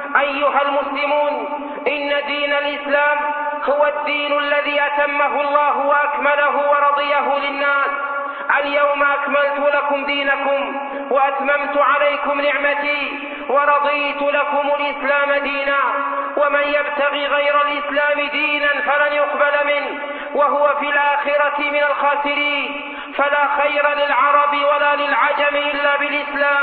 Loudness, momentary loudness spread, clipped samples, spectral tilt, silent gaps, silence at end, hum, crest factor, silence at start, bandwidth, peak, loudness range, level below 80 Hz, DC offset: -17 LUFS; 5 LU; under 0.1%; -6.5 dB/octave; none; 0 s; none; 16 dB; 0 s; 4.6 kHz; -2 dBFS; 2 LU; -60 dBFS; under 0.1%